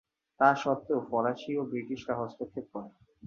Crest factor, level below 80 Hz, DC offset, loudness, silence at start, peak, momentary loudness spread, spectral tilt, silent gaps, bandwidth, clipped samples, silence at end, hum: 22 dB; -70 dBFS; under 0.1%; -31 LUFS; 0.4 s; -8 dBFS; 16 LU; -6.5 dB/octave; none; 7.4 kHz; under 0.1%; 0 s; none